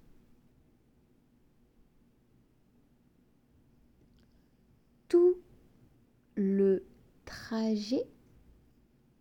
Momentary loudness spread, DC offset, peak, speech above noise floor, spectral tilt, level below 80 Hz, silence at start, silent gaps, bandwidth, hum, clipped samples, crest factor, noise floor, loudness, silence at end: 20 LU; under 0.1%; -16 dBFS; 39 dB; -7.5 dB/octave; -68 dBFS; 5.1 s; none; 9.4 kHz; none; under 0.1%; 20 dB; -67 dBFS; -30 LUFS; 1.15 s